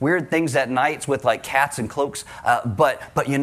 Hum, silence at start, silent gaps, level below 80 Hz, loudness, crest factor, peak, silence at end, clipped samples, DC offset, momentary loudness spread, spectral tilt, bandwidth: none; 0 s; none; -56 dBFS; -21 LUFS; 16 dB; -6 dBFS; 0 s; under 0.1%; under 0.1%; 5 LU; -5 dB/octave; 16 kHz